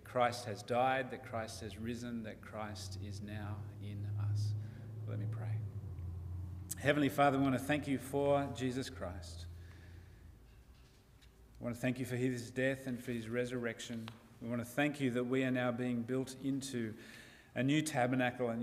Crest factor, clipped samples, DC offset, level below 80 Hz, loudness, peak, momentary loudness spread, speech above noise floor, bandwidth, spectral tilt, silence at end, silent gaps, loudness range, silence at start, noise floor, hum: 22 dB; under 0.1%; under 0.1%; -62 dBFS; -38 LUFS; -16 dBFS; 13 LU; 25 dB; 15.5 kHz; -6 dB/octave; 0 s; none; 8 LU; 0 s; -62 dBFS; none